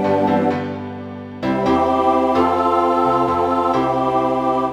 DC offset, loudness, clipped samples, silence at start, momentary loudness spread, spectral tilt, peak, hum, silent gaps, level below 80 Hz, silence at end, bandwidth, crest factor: under 0.1%; -17 LUFS; under 0.1%; 0 s; 11 LU; -7.5 dB/octave; -4 dBFS; none; none; -46 dBFS; 0 s; 12.5 kHz; 14 dB